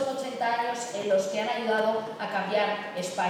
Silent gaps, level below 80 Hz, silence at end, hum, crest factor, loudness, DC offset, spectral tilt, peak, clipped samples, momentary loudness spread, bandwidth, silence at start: none; -82 dBFS; 0 s; none; 14 dB; -28 LUFS; under 0.1%; -3.5 dB/octave; -14 dBFS; under 0.1%; 6 LU; 15.5 kHz; 0 s